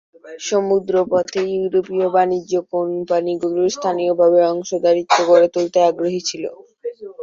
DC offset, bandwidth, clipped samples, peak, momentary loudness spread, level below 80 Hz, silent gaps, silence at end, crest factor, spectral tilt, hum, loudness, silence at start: under 0.1%; 7.6 kHz; under 0.1%; -2 dBFS; 12 LU; -64 dBFS; none; 0 s; 16 dB; -4.5 dB/octave; none; -17 LUFS; 0.25 s